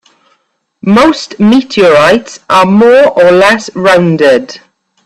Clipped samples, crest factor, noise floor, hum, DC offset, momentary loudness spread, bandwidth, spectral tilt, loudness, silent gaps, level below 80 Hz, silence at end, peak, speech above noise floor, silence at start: 0.3%; 8 dB; -57 dBFS; none; under 0.1%; 6 LU; 13.5 kHz; -5.5 dB/octave; -6 LUFS; none; -46 dBFS; 0.5 s; 0 dBFS; 51 dB; 0.85 s